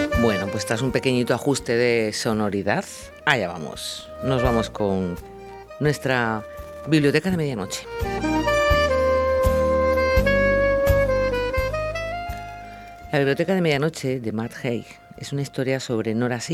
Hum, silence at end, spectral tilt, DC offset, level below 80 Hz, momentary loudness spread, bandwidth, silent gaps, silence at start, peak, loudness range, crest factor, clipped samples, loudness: none; 0 s; -5.5 dB/octave; under 0.1%; -36 dBFS; 12 LU; 16 kHz; none; 0 s; -2 dBFS; 5 LU; 22 dB; under 0.1%; -22 LUFS